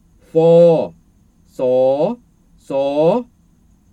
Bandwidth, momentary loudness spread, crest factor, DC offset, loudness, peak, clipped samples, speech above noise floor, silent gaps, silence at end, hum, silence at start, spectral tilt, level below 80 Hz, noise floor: 8.4 kHz; 13 LU; 14 dB; under 0.1%; -15 LUFS; -2 dBFS; under 0.1%; 39 dB; none; 0.7 s; none; 0.35 s; -8.5 dB/octave; -56 dBFS; -53 dBFS